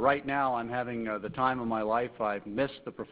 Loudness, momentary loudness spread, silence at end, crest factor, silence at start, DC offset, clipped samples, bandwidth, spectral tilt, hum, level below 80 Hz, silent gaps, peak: -31 LUFS; 5 LU; 0 s; 20 dB; 0 s; under 0.1%; under 0.1%; 4 kHz; -4 dB/octave; none; -62 dBFS; none; -10 dBFS